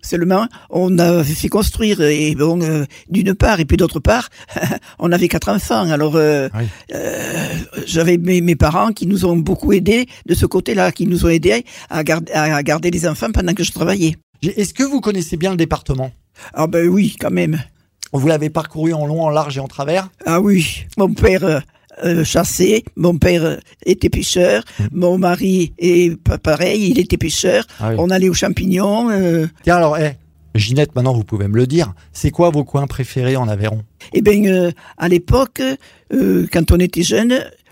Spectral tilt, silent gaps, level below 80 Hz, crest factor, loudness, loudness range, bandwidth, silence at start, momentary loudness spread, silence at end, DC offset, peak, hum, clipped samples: -5.5 dB/octave; 14.23-14.33 s; -30 dBFS; 14 dB; -16 LUFS; 3 LU; 16.5 kHz; 0.05 s; 8 LU; 0.2 s; under 0.1%; -2 dBFS; none; under 0.1%